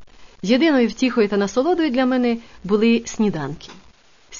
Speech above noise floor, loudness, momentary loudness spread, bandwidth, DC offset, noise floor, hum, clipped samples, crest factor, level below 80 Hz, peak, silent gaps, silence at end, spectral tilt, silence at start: 34 dB; -19 LUFS; 12 LU; 7.4 kHz; 0.4%; -52 dBFS; none; under 0.1%; 16 dB; -50 dBFS; -4 dBFS; none; 0 s; -5.5 dB/octave; 0 s